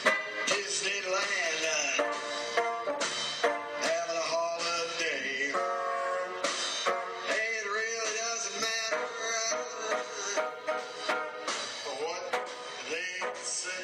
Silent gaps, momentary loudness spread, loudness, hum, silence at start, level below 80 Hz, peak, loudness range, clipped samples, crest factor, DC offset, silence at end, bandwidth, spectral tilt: none; 6 LU; -31 LUFS; none; 0 s; -82 dBFS; -10 dBFS; 4 LU; under 0.1%; 22 dB; under 0.1%; 0 s; 16 kHz; 0 dB/octave